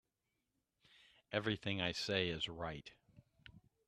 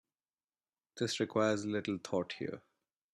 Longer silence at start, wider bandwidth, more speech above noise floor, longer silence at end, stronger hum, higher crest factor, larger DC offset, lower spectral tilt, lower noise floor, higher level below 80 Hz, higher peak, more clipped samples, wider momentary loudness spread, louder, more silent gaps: first, 1.3 s vs 0.95 s; about the same, 13 kHz vs 12.5 kHz; second, 47 dB vs over 55 dB; second, 0.3 s vs 0.55 s; neither; about the same, 24 dB vs 20 dB; neither; about the same, -4.5 dB/octave vs -5 dB/octave; about the same, -88 dBFS vs under -90 dBFS; first, -68 dBFS vs -76 dBFS; about the same, -20 dBFS vs -18 dBFS; neither; about the same, 11 LU vs 12 LU; second, -40 LUFS vs -36 LUFS; neither